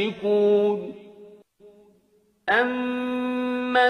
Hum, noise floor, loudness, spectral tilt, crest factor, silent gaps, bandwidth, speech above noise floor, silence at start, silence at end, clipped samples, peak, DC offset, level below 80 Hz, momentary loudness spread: none; -63 dBFS; -23 LUFS; -6 dB/octave; 16 dB; none; 9.8 kHz; 41 dB; 0 s; 0 s; under 0.1%; -8 dBFS; under 0.1%; -68 dBFS; 13 LU